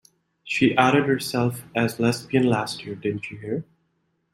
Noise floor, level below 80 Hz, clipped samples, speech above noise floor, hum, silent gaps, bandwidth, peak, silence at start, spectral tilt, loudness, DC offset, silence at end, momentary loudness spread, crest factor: -71 dBFS; -62 dBFS; under 0.1%; 49 dB; none; none; 16 kHz; -2 dBFS; 0.45 s; -5.5 dB/octave; -23 LUFS; under 0.1%; 0.7 s; 12 LU; 22 dB